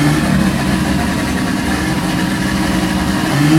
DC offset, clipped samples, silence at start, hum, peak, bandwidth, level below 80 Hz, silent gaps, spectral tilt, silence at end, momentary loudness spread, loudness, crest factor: under 0.1%; under 0.1%; 0 s; none; 0 dBFS; 16.5 kHz; -28 dBFS; none; -5.5 dB/octave; 0 s; 3 LU; -15 LUFS; 14 dB